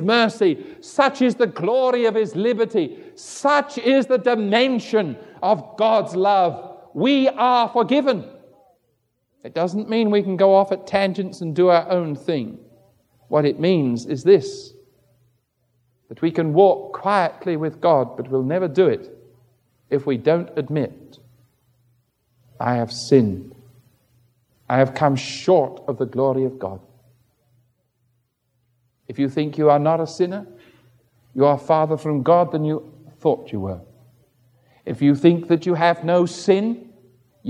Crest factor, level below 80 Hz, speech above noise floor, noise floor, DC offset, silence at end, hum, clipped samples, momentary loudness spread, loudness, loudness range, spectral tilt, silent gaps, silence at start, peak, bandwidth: 20 dB; -68 dBFS; 50 dB; -69 dBFS; under 0.1%; 0 s; none; under 0.1%; 12 LU; -19 LUFS; 5 LU; -6.5 dB/octave; none; 0 s; -2 dBFS; 11 kHz